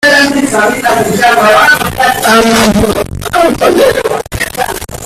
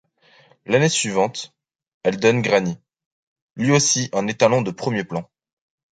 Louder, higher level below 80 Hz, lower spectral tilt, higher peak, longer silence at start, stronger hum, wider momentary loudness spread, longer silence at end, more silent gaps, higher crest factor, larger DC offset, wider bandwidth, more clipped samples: first, -8 LUFS vs -20 LUFS; first, -30 dBFS vs -60 dBFS; about the same, -3.5 dB/octave vs -4 dB/octave; about the same, 0 dBFS vs -2 dBFS; second, 0 s vs 0.7 s; neither; second, 9 LU vs 13 LU; second, 0 s vs 0.7 s; second, none vs 1.94-2.01 s, 3.06-3.36 s, 3.42-3.55 s; second, 8 dB vs 20 dB; neither; first, 16.5 kHz vs 9.4 kHz; first, 0.2% vs under 0.1%